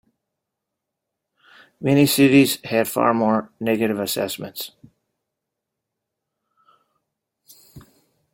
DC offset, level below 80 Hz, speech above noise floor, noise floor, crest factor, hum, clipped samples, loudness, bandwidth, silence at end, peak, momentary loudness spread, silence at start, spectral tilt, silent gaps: under 0.1%; -62 dBFS; 63 dB; -82 dBFS; 20 dB; none; under 0.1%; -19 LUFS; 17 kHz; 0.55 s; -2 dBFS; 15 LU; 1.8 s; -5 dB/octave; none